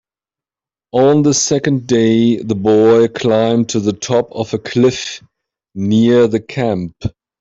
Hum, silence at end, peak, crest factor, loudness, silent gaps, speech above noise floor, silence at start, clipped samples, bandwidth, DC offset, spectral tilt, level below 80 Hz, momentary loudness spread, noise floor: none; 0.3 s; -2 dBFS; 12 dB; -14 LUFS; none; over 77 dB; 0.95 s; under 0.1%; 8 kHz; under 0.1%; -5.5 dB/octave; -48 dBFS; 13 LU; under -90 dBFS